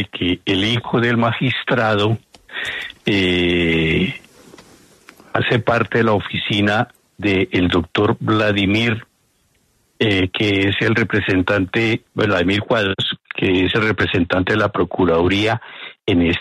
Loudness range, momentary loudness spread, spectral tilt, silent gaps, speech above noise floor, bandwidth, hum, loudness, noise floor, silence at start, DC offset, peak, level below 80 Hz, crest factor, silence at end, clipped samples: 2 LU; 8 LU; -6.5 dB/octave; none; 44 dB; 12.5 kHz; none; -18 LUFS; -61 dBFS; 0 s; under 0.1%; -2 dBFS; -44 dBFS; 16 dB; 0 s; under 0.1%